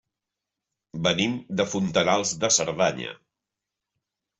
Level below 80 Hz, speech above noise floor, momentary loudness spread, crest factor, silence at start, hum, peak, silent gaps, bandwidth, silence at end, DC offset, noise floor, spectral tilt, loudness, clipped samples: -62 dBFS; 62 dB; 11 LU; 20 dB; 0.95 s; none; -6 dBFS; none; 8.2 kHz; 1.25 s; under 0.1%; -86 dBFS; -3 dB/octave; -24 LUFS; under 0.1%